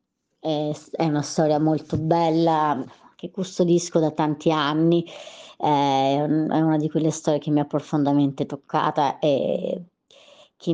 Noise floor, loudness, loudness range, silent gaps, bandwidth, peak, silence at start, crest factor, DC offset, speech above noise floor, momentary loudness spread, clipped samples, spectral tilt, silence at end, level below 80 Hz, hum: -52 dBFS; -22 LUFS; 2 LU; none; 9.6 kHz; -6 dBFS; 0.45 s; 16 dB; under 0.1%; 30 dB; 11 LU; under 0.1%; -6.5 dB/octave; 0 s; -62 dBFS; none